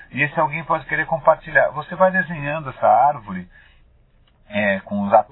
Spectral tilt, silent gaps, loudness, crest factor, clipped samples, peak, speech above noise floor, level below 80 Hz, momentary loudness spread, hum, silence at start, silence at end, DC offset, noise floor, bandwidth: -10 dB/octave; none; -19 LUFS; 20 dB; under 0.1%; 0 dBFS; 36 dB; -50 dBFS; 10 LU; none; 0.15 s; 0.1 s; under 0.1%; -55 dBFS; 4.1 kHz